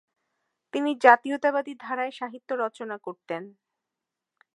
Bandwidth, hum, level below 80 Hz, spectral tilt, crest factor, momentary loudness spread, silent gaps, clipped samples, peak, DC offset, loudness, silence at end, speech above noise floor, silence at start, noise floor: 11.5 kHz; none; -82 dBFS; -4.5 dB/octave; 26 dB; 18 LU; none; under 0.1%; 0 dBFS; under 0.1%; -25 LUFS; 1.1 s; 62 dB; 0.75 s; -87 dBFS